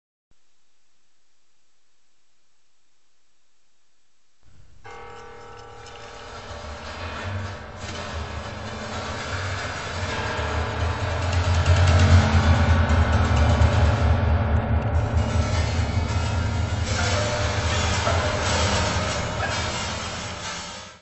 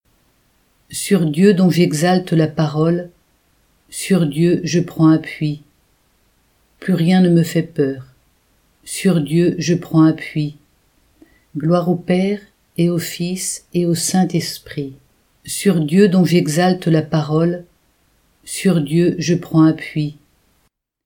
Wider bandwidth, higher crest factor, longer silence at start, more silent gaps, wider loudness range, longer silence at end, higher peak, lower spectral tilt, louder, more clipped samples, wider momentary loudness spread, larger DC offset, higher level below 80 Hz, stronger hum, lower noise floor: second, 8.4 kHz vs 18 kHz; about the same, 18 dB vs 18 dB; first, 4.45 s vs 0.9 s; neither; first, 17 LU vs 3 LU; second, 0 s vs 0.95 s; second, -6 dBFS vs 0 dBFS; about the same, -5 dB/octave vs -6 dB/octave; second, -23 LUFS vs -17 LUFS; neither; first, 18 LU vs 13 LU; first, 0.3% vs under 0.1%; first, -30 dBFS vs -56 dBFS; neither; first, -70 dBFS vs -64 dBFS